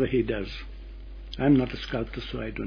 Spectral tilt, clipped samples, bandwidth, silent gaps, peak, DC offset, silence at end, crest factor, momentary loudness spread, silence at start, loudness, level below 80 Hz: -8 dB/octave; under 0.1%; 5.4 kHz; none; -10 dBFS; under 0.1%; 0 s; 18 dB; 22 LU; 0 s; -27 LUFS; -40 dBFS